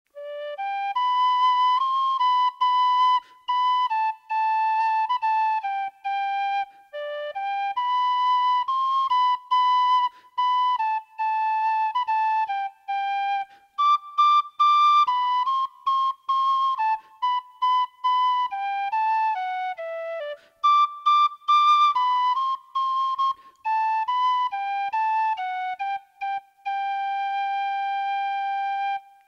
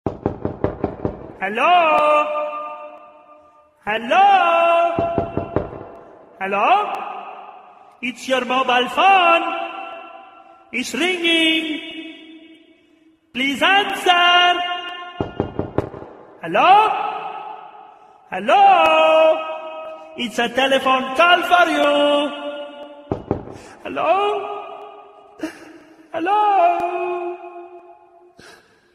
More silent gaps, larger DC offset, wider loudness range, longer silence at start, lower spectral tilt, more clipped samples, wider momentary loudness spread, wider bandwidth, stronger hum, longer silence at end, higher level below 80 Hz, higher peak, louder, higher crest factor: neither; neither; about the same, 5 LU vs 6 LU; about the same, 0.15 s vs 0.05 s; second, 2 dB/octave vs -4 dB/octave; neither; second, 10 LU vs 20 LU; second, 7 kHz vs 14.5 kHz; neither; second, 0.3 s vs 0.45 s; second, -82 dBFS vs -50 dBFS; second, -10 dBFS vs 0 dBFS; second, -23 LUFS vs -17 LUFS; second, 12 dB vs 18 dB